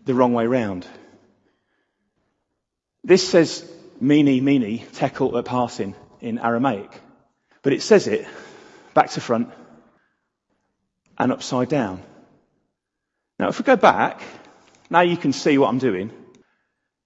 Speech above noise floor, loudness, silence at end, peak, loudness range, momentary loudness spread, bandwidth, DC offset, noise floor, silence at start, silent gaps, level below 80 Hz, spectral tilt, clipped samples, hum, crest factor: 61 dB; -20 LUFS; 0.9 s; 0 dBFS; 7 LU; 16 LU; 8.2 kHz; under 0.1%; -80 dBFS; 0.05 s; none; -66 dBFS; -5.5 dB/octave; under 0.1%; none; 22 dB